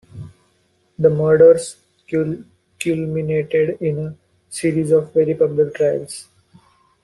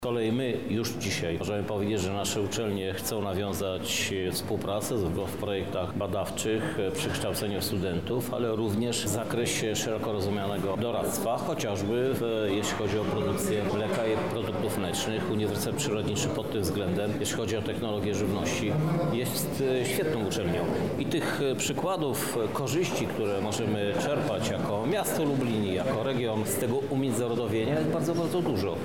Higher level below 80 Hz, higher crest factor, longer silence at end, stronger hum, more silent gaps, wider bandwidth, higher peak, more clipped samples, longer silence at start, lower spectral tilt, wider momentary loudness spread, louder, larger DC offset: about the same, -56 dBFS vs -54 dBFS; first, 16 dB vs 10 dB; first, 0.8 s vs 0 s; neither; neither; second, 12 kHz vs 17 kHz; first, -2 dBFS vs -18 dBFS; neither; first, 0.15 s vs 0 s; first, -6.5 dB/octave vs -5 dB/octave; first, 20 LU vs 3 LU; first, -18 LUFS vs -29 LUFS; second, under 0.1% vs 0.4%